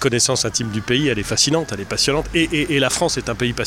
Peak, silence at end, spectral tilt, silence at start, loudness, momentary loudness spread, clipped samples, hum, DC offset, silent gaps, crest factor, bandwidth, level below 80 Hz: -2 dBFS; 0 s; -3 dB/octave; 0 s; -18 LUFS; 5 LU; under 0.1%; none; under 0.1%; none; 16 dB; 16.5 kHz; -38 dBFS